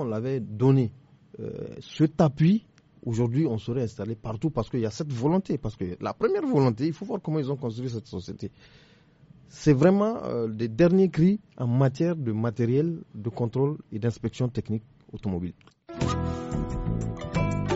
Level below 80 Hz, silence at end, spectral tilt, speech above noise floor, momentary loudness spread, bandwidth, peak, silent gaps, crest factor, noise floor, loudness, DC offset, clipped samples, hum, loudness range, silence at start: -46 dBFS; 0 s; -8 dB/octave; 30 dB; 14 LU; 8 kHz; -6 dBFS; none; 20 dB; -55 dBFS; -27 LUFS; under 0.1%; under 0.1%; none; 7 LU; 0 s